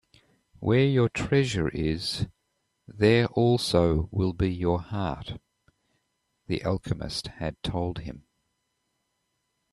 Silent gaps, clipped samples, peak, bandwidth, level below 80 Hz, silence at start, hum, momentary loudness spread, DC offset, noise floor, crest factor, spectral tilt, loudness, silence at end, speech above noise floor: none; under 0.1%; -6 dBFS; 13 kHz; -46 dBFS; 0.6 s; none; 12 LU; under 0.1%; -77 dBFS; 22 dB; -6.5 dB/octave; -26 LUFS; 1.55 s; 52 dB